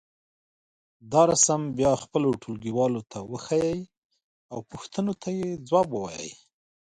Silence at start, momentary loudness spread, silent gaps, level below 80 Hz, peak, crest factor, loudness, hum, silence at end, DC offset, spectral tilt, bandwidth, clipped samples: 1.05 s; 17 LU; 3.98-4.10 s, 4.24-4.49 s; -58 dBFS; -8 dBFS; 20 dB; -25 LUFS; none; 0.6 s; under 0.1%; -4.5 dB/octave; 11.5 kHz; under 0.1%